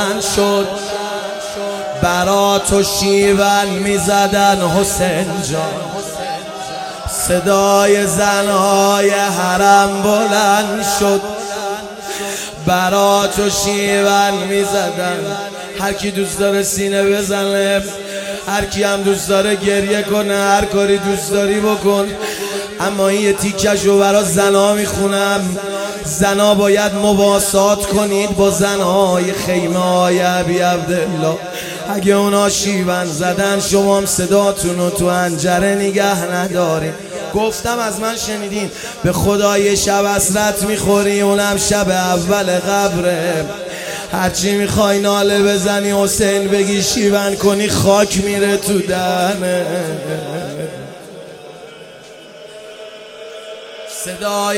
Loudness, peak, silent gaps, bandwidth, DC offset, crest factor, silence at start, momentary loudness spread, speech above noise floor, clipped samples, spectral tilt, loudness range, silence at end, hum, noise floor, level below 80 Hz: -15 LUFS; 0 dBFS; none; 16.5 kHz; under 0.1%; 14 dB; 0 s; 11 LU; 22 dB; under 0.1%; -4 dB/octave; 4 LU; 0 s; none; -37 dBFS; -40 dBFS